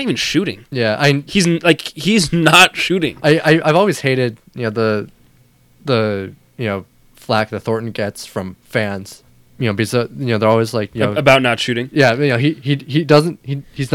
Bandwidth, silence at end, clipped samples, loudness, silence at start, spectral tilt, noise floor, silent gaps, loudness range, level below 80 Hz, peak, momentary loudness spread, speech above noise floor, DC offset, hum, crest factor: 17.5 kHz; 0 s; under 0.1%; -15 LUFS; 0 s; -5 dB/octave; -51 dBFS; none; 9 LU; -48 dBFS; 0 dBFS; 13 LU; 36 dB; under 0.1%; none; 16 dB